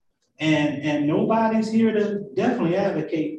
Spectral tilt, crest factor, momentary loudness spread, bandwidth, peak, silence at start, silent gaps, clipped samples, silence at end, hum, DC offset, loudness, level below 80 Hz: -7 dB/octave; 12 dB; 4 LU; 8.8 kHz; -8 dBFS; 0.4 s; none; under 0.1%; 0 s; none; under 0.1%; -22 LUFS; -62 dBFS